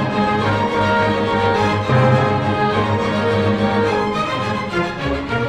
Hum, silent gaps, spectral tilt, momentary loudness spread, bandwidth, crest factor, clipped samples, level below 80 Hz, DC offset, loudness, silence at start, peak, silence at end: none; none; -6.5 dB/octave; 6 LU; 10.5 kHz; 14 dB; under 0.1%; -40 dBFS; under 0.1%; -17 LUFS; 0 s; -2 dBFS; 0 s